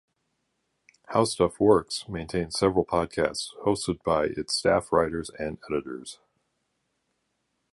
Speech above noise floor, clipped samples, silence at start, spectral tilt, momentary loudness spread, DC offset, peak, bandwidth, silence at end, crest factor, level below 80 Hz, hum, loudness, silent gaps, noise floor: 51 dB; under 0.1%; 1.1 s; -4.5 dB/octave; 10 LU; under 0.1%; -8 dBFS; 11.5 kHz; 1.6 s; 20 dB; -52 dBFS; none; -26 LUFS; none; -77 dBFS